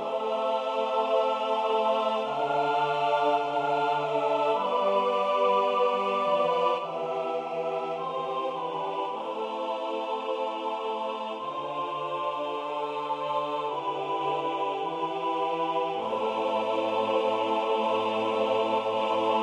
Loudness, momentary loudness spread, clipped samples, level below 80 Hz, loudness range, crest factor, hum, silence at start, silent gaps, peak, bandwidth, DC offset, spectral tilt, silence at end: -28 LUFS; 6 LU; under 0.1%; -78 dBFS; 6 LU; 14 dB; none; 0 s; none; -14 dBFS; 10.5 kHz; under 0.1%; -5 dB/octave; 0 s